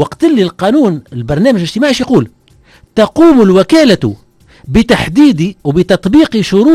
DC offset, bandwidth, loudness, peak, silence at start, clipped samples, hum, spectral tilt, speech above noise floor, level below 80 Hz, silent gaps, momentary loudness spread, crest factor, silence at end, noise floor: under 0.1%; 13.5 kHz; -10 LUFS; 0 dBFS; 0 s; 0.7%; none; -6.5 dB/octave; 35 dB; -34 dBFS; none; 7 LU; 10 dB; 0 s; -44 dBFS